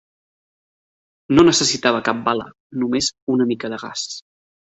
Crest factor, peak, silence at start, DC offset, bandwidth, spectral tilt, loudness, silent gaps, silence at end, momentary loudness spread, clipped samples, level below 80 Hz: 18 dB; -2 dBFS; 1.3 s; under 0.1%; 8.2 kHz; -3.5 dB/octave; -19 LUFS; 2.60-2.70 s, 3.22-3.27 s; 0.55 s; 14 LU; under 0.1%; -54 dBFS